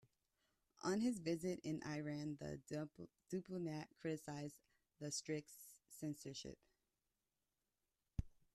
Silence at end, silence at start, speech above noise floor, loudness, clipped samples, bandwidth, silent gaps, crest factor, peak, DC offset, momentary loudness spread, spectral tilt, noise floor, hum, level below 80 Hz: 0.25 s; 0.85 s; over 44 dB; -47 LUFS; under 0.1%; 13.5 kHz; none; 20 dB; -28 dBFS; under 0.1%; 13 LU; -5 dB/octave; under -90 dBFS; none; -66 dBFS